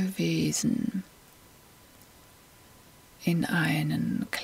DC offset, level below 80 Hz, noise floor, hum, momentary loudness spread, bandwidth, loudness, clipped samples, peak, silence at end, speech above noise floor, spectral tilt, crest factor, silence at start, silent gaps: under 0.1%; -60 dBFS; -55 dBFS; none; 8 LU; 16 kHz; -28 LUFS; under 0.1%; -12 dBFS; 0 s; 27 dB; -5 dB/octave; 18 dB; 0 s; none